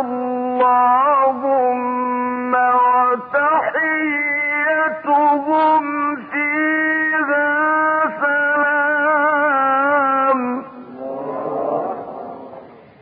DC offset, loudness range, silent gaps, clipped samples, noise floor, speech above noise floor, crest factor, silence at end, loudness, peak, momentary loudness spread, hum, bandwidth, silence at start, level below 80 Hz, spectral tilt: under 0.1%; 2 LU; none; under 0.1%; -39 dBFS; 24 dB; 12 dB; 0.2 s; -17 LUFS; -6 dBFS; 12 LU; none; 4.9 kHz; 0 s; -66 dBFS; -9.5 dB/octave